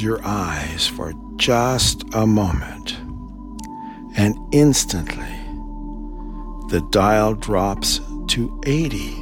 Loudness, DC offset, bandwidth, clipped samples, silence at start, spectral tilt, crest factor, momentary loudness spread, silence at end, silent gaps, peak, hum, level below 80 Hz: -20 LUFS; under 0.1%; 19 kHz; under 0.1%; 0 s; -4.5 dB/octave; 18 dB; 18 LU; 0 s; none; -2 dBFS; none; -32 dBFS